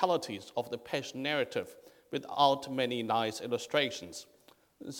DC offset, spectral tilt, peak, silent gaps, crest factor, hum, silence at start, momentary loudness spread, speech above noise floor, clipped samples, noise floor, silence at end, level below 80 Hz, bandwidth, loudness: under 0.1%; -4 dB/octave; -10 dBFS; none; 22 dB; none; 0 s; 14 LU; 26 dB; under 0.1%; -58 dBFS; 0 s; -76 dBFS; 19 kHz; -33 LUFS